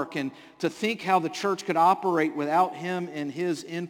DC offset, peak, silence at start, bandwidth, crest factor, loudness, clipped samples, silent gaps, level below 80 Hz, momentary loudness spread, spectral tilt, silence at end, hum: under 0.1%; -10 dBFS; 0 s; 17 kHz; 16 dB; -26 LUFS; under 0.1%; none; -76 dBFS; 10 LU; -5 dB/octave; 0 s; none